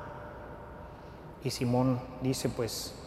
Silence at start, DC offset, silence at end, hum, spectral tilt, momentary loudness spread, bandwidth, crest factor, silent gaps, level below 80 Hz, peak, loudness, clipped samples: 0 s; under 0.1%; 0 s; none; -5.5 dB/octave; 18 LU; 15.5 kHz; 20 dB; none; -54 dBFS; -14 dBFS; -32 LUFS; under 0.1%